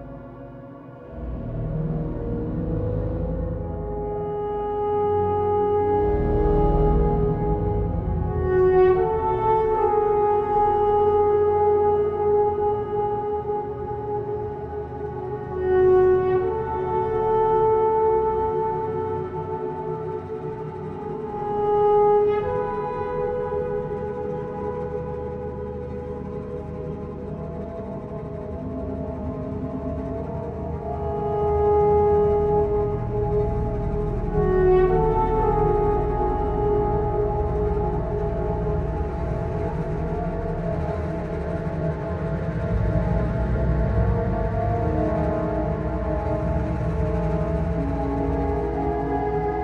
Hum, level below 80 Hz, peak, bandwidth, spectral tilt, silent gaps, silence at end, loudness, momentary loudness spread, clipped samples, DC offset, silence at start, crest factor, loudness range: none; -32 dBFS; -8 dBFS; 4.9 kHz; -10.5 dB/octave; none; 0 s; -24 LUFS; 12 LU; under 0.1%; under 0.1%; 0 s; 14 dB; 9 LU